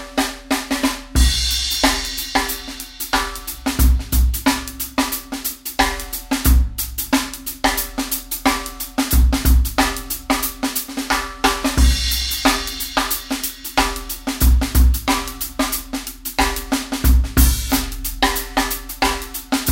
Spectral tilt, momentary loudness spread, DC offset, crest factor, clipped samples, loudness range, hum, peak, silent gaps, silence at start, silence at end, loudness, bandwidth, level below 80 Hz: -3.5 dB/octave; 8 LU; under 0.1%; 18 dB; under 0.1%; 2 LU; none; 0 dBFS; none; 0 s; 0 s; -19 LUFS; 17 kHz; -22 dBFS